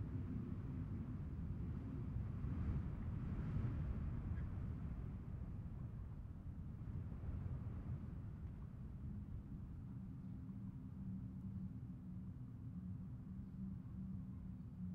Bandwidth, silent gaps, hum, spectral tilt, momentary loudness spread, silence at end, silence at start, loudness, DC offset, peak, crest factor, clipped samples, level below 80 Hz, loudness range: 5 kHz; none; none; -10.5 dB/octave; 7 LU; 0 s; 0 s; -49 LUFS; under 0.1%; -32 dBFS; 16 dB; under 0.1%; -54 dBFS; 6 LU